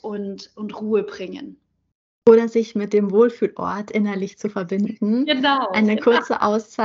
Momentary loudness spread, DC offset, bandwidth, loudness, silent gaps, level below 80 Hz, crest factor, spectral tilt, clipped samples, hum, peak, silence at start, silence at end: 15 LU; under 0.1%; 7.6 kHz; -20 LUFS; 1.95-2.22 s; -64 dBFS; 20 dB; -6 dB/octave; under 0.1%; none; 0 dBFS; 0.05 s; 0 s